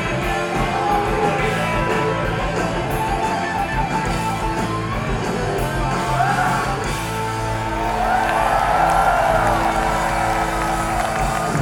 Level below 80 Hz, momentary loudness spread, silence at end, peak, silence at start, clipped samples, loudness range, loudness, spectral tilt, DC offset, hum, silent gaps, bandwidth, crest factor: -30 dBFS; 6 LU; 0 s; -4 dBFS; 0 s; under 0.1%; 4 LU; -20 LUFS; -5 dB/octave; under 0.1%; none; none; 19 kHz; 16 dB